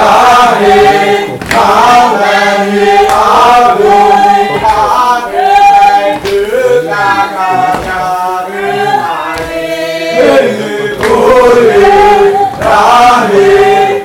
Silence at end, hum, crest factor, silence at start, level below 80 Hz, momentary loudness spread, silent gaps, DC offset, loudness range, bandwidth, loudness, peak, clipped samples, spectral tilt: 0 s; none; 6 dB; 0 s; -34 dBFS; 9 LU; none; under 0.1%; 5 LU; 17 kHz; -7 LUFS; 0 dBFS; 4%; -4 dB/octave